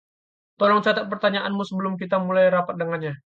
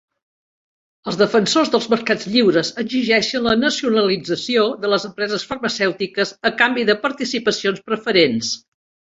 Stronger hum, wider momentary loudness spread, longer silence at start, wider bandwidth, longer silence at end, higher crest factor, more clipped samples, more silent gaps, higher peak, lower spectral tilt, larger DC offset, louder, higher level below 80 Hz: neither; about the same, 8 LU vs 7 LU; second, 0.6 s vs 1.05 s; about the same, 7.4 kHz vs 8 kHz; second, 0.2 s vs 0.6 s; about the same, 16 dB vs 18 dB; neither; neither; second, -6 dBFS vs -2 dBFS; first, -7 dB/octave vs -4 dB/octave; neither; second, -22 LUFS vs -18 LUFS; second, -70 dBFS vs -56 dBFS